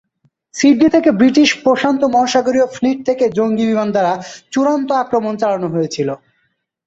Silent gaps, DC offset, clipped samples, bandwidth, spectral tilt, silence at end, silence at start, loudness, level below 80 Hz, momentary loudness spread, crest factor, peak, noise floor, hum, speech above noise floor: none; under 0.1%; under 0.1%; 8 kHz; -5 dB/octave; 0.7 s; 0.55 s; -15 LUFS; -56 dBFS; 9 LU; 14 dB; -2 dBFS; -66 dBFS; none; 52 dB